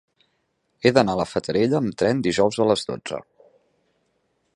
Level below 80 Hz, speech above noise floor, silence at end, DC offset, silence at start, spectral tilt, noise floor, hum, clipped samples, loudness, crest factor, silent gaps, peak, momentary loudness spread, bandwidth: -56 dBFS; 50 dB; 1.35 s; under 0.1%; 0.85 s; -5.5 dB/octave; -71 dBFS; none; under 0.1%; -22 LUFS; 22 dB; none; 0 dBFS; 12 LU; 11.5 kHz